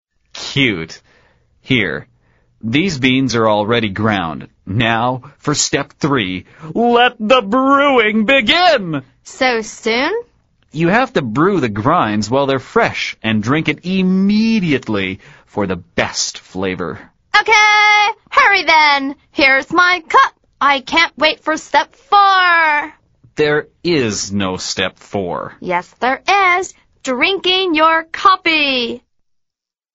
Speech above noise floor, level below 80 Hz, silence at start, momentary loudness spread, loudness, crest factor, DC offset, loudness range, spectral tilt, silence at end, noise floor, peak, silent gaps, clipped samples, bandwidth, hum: 65 dB; -48 dBFS; 0.35 s; 13 LU; -14 LUFS; 16 dB; under 0.1%; 6 LU; -4 dB/octave; 0.95 s; -79 dBFS; 0 dBFS; none; under 0.1%; 8.2 kHz; none